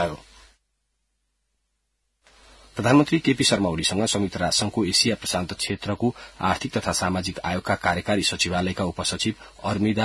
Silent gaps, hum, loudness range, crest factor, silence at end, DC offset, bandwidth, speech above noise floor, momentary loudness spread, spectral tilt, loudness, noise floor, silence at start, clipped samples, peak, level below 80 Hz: none; none; 4 LU; 18 dB; 0 s; under 0.1%; 12 kHz; 51 dB; 8 LU; -4 dB/octave; -23 LUFS; -74 dBFS; 0 s; under 0.1%; -6 dBFS; -52 dBFS